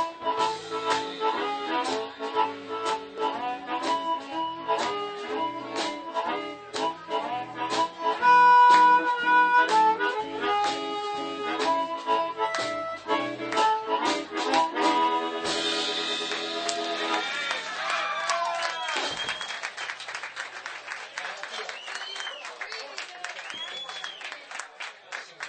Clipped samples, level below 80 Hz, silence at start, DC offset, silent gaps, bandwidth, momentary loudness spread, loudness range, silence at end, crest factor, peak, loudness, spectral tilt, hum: under 0.1%; -72 dBFS; 0 s; under 0.1%; none; 9.2 kHz; 15 LU; 14 LU; 0 s; 22 dB; -4 dBFS; -26 LUFS; -1.5 dB/octave; none